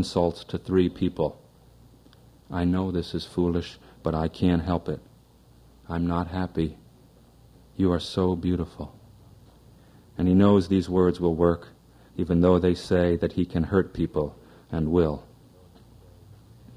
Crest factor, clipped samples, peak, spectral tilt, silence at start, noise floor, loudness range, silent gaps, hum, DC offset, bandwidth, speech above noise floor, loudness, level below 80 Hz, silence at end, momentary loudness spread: 20 dB; under 0.1%; -6 dBFS; -8 dB/octave; 0 s; -55 dBFS; 7 LU; none; none; under 0.1%; 10.5 kHz; 31 dB; -25 LUFS; -48 dBFS; 0 s; 14 LU